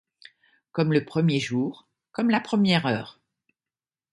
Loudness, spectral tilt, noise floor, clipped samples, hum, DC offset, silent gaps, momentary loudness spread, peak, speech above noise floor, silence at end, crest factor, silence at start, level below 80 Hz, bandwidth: -24 LUFS; -6.5 dB/octave; under -90 dBFS; under 0.1%; none; under 0.1%; none; 11 LU; -8 dBFS; over 67 dB; 1.05 s; 20 dB; 0.75 s; -66 dBFS; 11.5 kHz